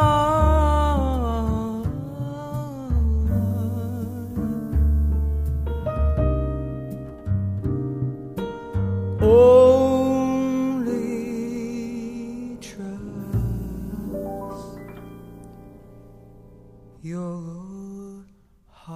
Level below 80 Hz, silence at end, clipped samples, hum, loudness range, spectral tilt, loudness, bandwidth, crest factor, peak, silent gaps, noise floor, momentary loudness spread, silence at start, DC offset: -28 dBFS; 0 s; under 0.1%; none; 19 LU; -8.5 dB/octave; -23 LUFS; 15 kHz; 18 dB; -4 dBFS; none; -55 dBFS; 17 LU; 0 s; under 0.1%